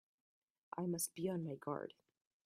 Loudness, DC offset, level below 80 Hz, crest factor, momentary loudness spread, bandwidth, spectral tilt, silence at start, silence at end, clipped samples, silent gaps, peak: -43 LUFS; under 0.1%; -84 dBFS; 18 dB; 9 LU; 13 kHz; -5 dB/octave; 0.75 s; 0.55 s; under 0.1%; none; -28 dBFS